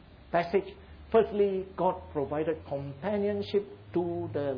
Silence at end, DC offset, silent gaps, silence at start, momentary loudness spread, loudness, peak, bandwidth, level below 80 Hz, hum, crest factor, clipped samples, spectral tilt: 0 s; under 0.1%; none; 0.1 s; 8 LU; -31 LUFS; -12 dBFS; 5.4 kHz; -56 dBFS; none; 18 dB; under 0.1%; -9 dB/octave